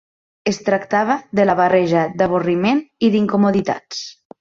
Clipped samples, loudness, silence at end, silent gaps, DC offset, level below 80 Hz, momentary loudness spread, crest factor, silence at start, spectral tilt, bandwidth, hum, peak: under 0.1%; -17 LUFS; 0.3 s; none; under 0.1%; -56 dBFS; 10 LU; 14 dB; 0.45 s; -6 dB/octave; 7.6 kHz; none; -2 dBFS